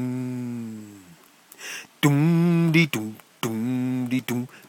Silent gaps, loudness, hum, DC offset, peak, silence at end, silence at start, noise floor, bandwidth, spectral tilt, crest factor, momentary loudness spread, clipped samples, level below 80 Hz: none; -23 LUFS; none; under 0.1%; -6 dBFS; 0.1 s; 0 s; -52 dBFS; 17.5 kHz; -6 dB/octave; 18 dB; 17 LU; under 0.1%; -70 dBFS